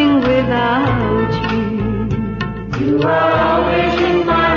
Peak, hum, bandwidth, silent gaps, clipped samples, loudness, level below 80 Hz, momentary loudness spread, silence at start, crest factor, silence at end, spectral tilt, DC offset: -4 dBFS; none; 7.2 kHz; none; under 0.1%; -16 LUFS; -32 dBFS; 7 LU; 0 s; 12 dB; 0 s; -7.5 dB/octave; under 0.1%